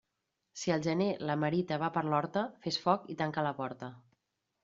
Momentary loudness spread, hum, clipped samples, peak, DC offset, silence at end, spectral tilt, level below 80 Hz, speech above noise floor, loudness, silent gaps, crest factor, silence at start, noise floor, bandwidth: 9 LU; none; under 0.1%; -14 dBFS; under 0.1%; 0.65 s; -4.5 dB/octave; -72 dBFS; 52 dB; -33 LUFS; none; 20 dB; 0.55 s; -85 dBFS; 7.6 kHz